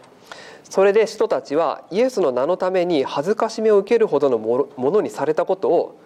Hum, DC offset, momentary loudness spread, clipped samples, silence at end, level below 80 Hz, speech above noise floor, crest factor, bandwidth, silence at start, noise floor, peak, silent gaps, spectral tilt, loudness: none; under 0.1%; 6 LU; under 0.1%; 0.15 s; -70 dBFS; 23 dB; 12 dB; 12.5 kHz; 0.3 s; -41 dBFS; -6 dBFS; none; -5.5 dB/octave; -19 LUFS